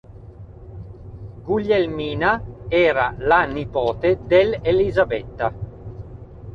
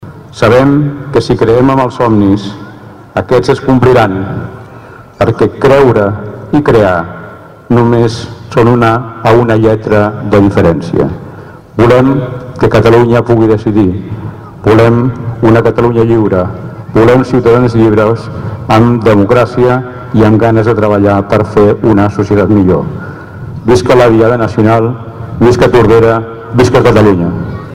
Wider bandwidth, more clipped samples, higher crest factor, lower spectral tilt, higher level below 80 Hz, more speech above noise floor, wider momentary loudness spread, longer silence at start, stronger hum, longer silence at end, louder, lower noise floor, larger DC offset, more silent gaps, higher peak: second, 6.8 kHz vs 12.5 kHz; second, under 0.1% vs 0.8%; first, 18 dB vs 8 dB; about the same, -8 dB/octave vs -8 dB/octave; second, -40 dBFS vs -32 dBFS; second, 20 dB vs 24 dB; first, 21 LU vs 13 LU; about the same, 0.1 s vs 0 s; neither; about the same, 0 s vs 0 s; second, -20 LUFS vs -8 LUFS; first, -40 dBFS vs -31 dBFS; neither; neither; about the same, -2 dBFS vs 0 dBFS